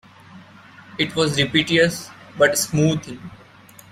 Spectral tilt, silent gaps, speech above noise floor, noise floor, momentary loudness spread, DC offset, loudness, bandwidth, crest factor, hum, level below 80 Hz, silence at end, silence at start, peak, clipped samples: -4 dB/octave; none; 27 dB; -46 dBFS; 20 LU; under 0.1%; -19 LUFS; 16 kHz; 20 dB; none; -52 dBFS; 0.55 s; 0.3 s; -2 dBFS; under 0.1%